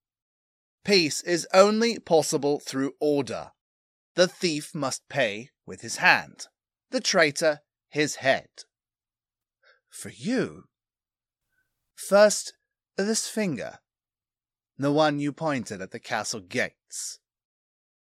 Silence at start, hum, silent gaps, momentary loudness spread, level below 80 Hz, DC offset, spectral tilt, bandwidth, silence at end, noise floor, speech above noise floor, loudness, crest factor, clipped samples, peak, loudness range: 0.85 s; none; 3.61-4.15 s; 17 LU; -74 dBFS; under 0.1%; -3.5 dB/octave; 15 kHz; 0.95 s; under -90 dBFS; over 65 dB; -25 LUFS; 24 dB; under 0.1%; -2 dBFS; 7 LU